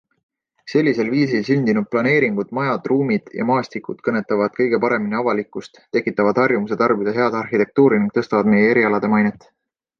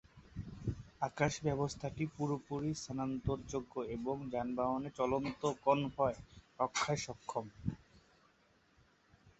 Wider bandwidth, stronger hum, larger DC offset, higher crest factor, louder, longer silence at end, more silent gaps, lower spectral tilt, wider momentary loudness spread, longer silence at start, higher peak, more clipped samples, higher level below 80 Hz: second, 6.8 kHz vs 8 kHz; neither; neither; second, 16 dB vs 22 dB; first, -18 LUFS vs -38 LUFS; first, 0.7 s vs 0.1 s; neither; first, -7.5 dB/octave vs -5.5 dB/octave; second, 7 LU vs 10 LU; first, 0.65 s vs 0.15 s; first, -2 dBFS vs -16 dBFS; neither; about the same, -60 dBFS vs -58 dBFS